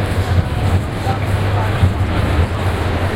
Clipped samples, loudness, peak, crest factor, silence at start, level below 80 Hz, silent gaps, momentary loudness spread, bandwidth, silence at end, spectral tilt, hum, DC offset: under 0.1%; -17 LUFS; -2 dBFS; 14 dB; 0 s; -24 dBFS; none; 2 LU; 15.5 kHz; 0 s; -7 dB/octave; none; under 0.1%